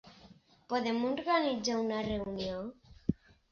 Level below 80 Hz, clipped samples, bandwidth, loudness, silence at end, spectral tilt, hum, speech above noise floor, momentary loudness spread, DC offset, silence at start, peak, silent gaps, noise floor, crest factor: -56 dBFS; under 0.1%; 7.2 kHz; -34 LUFS; 0.4 s; -4 dB/octave; none; 27 dB; 10 LU; under 0.1%; 0.05 s; -16 dBFS; none; -60 dBFS; 20 dB